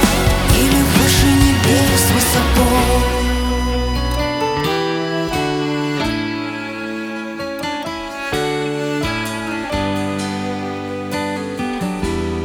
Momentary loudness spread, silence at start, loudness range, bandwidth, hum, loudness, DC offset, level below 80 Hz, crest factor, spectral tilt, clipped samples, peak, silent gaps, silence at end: 12 LU; 0 s; 8 LU; 20 kHz; none; -17 LUFS; under 0.1%; -24 dBFS; 16 dB; -4.5 dB/octave; under 0.1%; 0 dBFS; none; 0 s